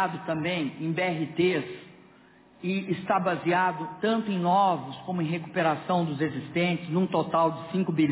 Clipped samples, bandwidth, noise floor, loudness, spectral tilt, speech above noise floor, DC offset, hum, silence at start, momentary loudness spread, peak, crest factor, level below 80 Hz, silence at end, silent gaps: under 0.1%; 4 kHz; -56 dBFS; -27 LUFS; -10.5 dB/octave; 29 dB; under 0.1%; none; 0 s; 7 LU; -12 dBFS; 14 dB; -68 dBFS; 0 s; none